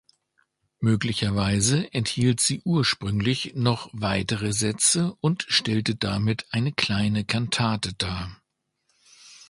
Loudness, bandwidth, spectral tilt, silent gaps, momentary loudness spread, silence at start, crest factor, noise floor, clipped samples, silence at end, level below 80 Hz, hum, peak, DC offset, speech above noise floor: -24 LUFS; 11.5 kHz; -4 dB/octave; none; 6 LU; 0.8 s; 22 dB; -74 dBFS; under 0.1%; 0.15 s; -48 dBFS; none; -4 dBFS; under 0.1%; 50 dB